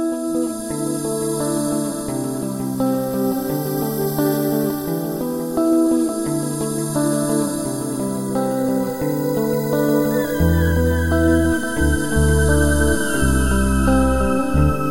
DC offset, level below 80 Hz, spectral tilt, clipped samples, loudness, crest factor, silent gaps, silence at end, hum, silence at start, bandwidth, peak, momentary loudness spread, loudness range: under 0.1%; -28 dBFS; -6 dB/octave; under 0.1%; -19 LUFS; 14 dB; none; 0 s; none; 0 s; 16 kHz; -4 dBFS; 7 LU; 4 LU